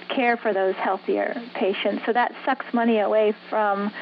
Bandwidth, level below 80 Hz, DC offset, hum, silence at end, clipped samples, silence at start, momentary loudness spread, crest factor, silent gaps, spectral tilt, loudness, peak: 5.4 kHz; -84 dBFS; under 0.1%; none; 0 s; under 0.1%; 0 s; 5 LU; 14 dB; none; -8 dB/octave; -23 LUFS; -8 dBFS